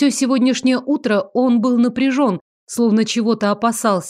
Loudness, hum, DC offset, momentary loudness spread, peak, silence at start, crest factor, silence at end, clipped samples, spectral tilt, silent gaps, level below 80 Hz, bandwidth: -17 LUFS; none; under 0.1%; 4 LU; -4 dBFS; 0 s; 12 dB; 0 s; under 0.1%; -4.5 dB/octave; 2.41-2.67 s; -64 dBFS; 14.5 kHz